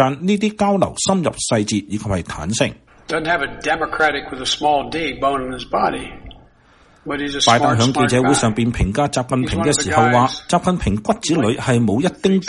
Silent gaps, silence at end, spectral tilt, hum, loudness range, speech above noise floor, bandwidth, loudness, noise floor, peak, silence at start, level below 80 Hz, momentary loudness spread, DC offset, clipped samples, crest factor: none; 0 s; -4.5 dB/octave; none; 4 LU; 33 dB; 11.5 kHz; -18 LUFS; -51 dBFS; 0 dBFS; 0 s; -38 dBFS; 9 LU; under 0.1%; under 0.1%; 18 dB